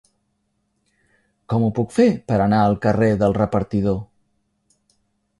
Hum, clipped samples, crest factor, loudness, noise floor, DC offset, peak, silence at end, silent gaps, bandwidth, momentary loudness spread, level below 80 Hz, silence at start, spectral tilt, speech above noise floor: none; under 0.1%; 18 dB; -19 LUFS; -70 dBFS; under 0.1%; -4 dBFS; 1.35 s; none; 11.5 kHz; 5 LU; -46 dBFS; 1.5 s; -8.5 dB/octave; 52 dB